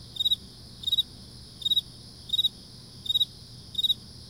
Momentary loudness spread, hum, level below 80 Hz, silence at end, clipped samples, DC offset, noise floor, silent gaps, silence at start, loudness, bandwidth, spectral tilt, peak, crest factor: 20 LU; none; -56 dBFS; 0 s; under 0.1%; under 0.1%; -47 dBFS; none; 0 s; -26 LUFS; 16 kHz; -2 dB/octave; -16 dBFS; 16 dB